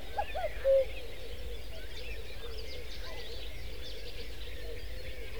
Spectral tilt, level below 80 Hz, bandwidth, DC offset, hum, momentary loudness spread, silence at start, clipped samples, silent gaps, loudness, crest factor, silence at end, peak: -4.5 dB/octave; -46 dBFS; over 20 kHz; 1%; none; 15 LU; 0 s; under 0.1%; none; -38 LUFS; 18 dB; 0 s; -18 dBFS